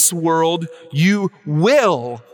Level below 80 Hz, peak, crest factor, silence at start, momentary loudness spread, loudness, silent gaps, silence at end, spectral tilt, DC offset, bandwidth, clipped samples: -72 dBFS; -2 dBFS; 14 dB; 0 s; 10 LU; -17 LUFS; none; 0.15 s; -4.5 dB/octave; under 0.1%; 19 kHz; under 0.1%